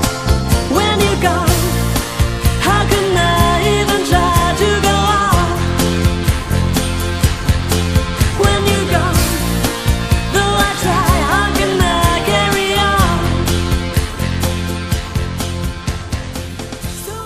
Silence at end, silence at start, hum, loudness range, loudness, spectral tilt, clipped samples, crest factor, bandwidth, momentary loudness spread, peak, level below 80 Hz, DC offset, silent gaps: 0 s; 0 s; none; 4 LU; -15 LUFS; -4.5 dB/octave; under 0.1%; 14 dB; 15.5 kHz; 8 LU; 0 dBFS; -22 dBFS; under 0.1%; none